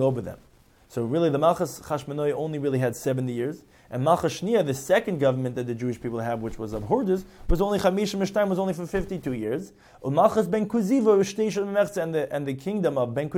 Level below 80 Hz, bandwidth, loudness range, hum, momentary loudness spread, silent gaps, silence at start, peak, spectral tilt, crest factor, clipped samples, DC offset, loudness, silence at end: -42 dBFS; 17 kHz; 2 LU; none; 10 LU; none; 0 s; -6 dBFS; -6.5 dB/octave; 20 dB; under 0.1%; under 0.1%; -25 LUFS; 0 s